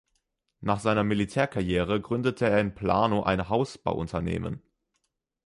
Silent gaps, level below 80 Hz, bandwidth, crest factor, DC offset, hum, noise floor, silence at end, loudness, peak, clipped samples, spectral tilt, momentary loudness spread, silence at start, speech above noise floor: none; -48 dBFS; 11.5 kHz; 20 dB; under 0.1%; none; -78 dBFS; 0.85 s; -27 LUFS; -8 dBFS; under 0.1%; -7 dB/octave; 7 LU; 0.6 s; 52 dB